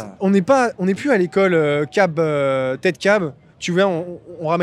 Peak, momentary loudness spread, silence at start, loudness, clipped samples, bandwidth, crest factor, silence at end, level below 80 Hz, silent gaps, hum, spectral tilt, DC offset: -2 dBFS; 9 LU; 0 s; -18 LUFS; under 0.1%; 11.5 kHz; 16 dB; 0 s; -62 dBFS; none; none; -6 dB/octave; under 0.1%